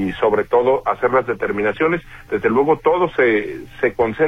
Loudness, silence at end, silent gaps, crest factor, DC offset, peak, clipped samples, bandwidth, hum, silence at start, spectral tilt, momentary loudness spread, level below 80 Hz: -18 LUFS; 0 s; none; 14 dB; under 0.1%; -4 dBFS; under 0.1%; 6.6 kHz; none; 0 s; -7.5 dB/octave; 6 LU; -46 dBFS